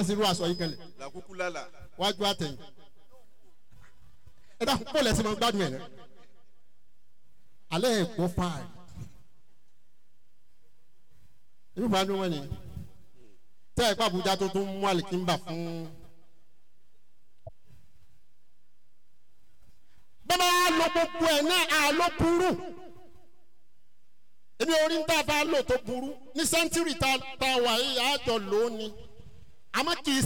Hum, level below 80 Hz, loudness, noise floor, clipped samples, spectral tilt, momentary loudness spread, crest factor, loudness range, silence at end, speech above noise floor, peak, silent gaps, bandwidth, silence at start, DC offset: none; -54 dBFS; -27 LUFS; -75 dBFS; under 0.1%; -3.5 dB/octave; 19 LU; 14 dB; 9 LU; 0 s; 47 dB; -16 dBFS; none; 19 kHz; 0 s; 0.8%